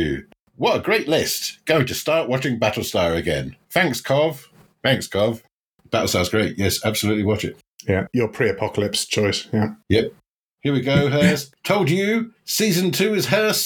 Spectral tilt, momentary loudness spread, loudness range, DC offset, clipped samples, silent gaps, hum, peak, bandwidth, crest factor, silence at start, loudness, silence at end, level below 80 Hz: -4.5 dB/octave; 6 LU; 2 LU; under 0.1%; under 0.1%; 0.40-0.46 s, 5.52-5.79 s, 7.68-7.79 s, 10.30-10.58 s; none; -2 dBFS; 19 kHz; 20 dB; 0 s; -21 LUFS; 0 s; -48 dBFS